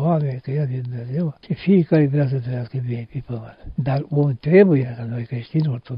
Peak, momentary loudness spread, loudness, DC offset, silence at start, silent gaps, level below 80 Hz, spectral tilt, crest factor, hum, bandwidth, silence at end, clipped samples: -2 dBFS; 14 LU; -21 LUFS; under 0.1%; 0 s; none; -50 dBFS; -12.5 dB/octave; 18 dB; none; 5.4 kHz; 0 s; under 0.1%